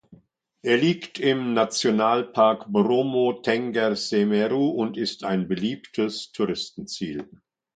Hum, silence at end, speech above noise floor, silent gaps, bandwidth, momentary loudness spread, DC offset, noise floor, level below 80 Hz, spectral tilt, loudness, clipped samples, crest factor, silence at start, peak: none; 0.5 s; 35 dB; none; 9.2 kHz; 10 LU; under 0.1%; -59 dBFS; -66 dBFS; -5 dB/octave; -24 LUFS; under 0.1%; 18 dB; 0.1 s; -6 dBFS